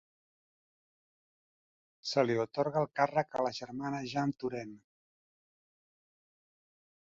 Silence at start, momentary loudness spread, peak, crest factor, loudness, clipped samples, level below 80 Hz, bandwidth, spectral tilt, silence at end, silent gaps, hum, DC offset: 2.05 s; 9 LU; -14 dBFS; 22 dB; -34 LUFS; under 0.1%; -76 dBFS; 7.4 kHz; -4.5 dB/octave; 2.25 s; none; none; under 0.1%